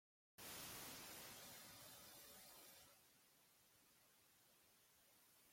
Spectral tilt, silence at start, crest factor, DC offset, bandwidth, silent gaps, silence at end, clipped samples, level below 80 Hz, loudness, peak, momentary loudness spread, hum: -1.5 dB/octave; 0.4 s; 20 dB; under 0.1%; 16.5 kHz; none; 0 s; under 0.1%; -86 dBFS; -57 LUFS; -44 dBFS; 10 LU; none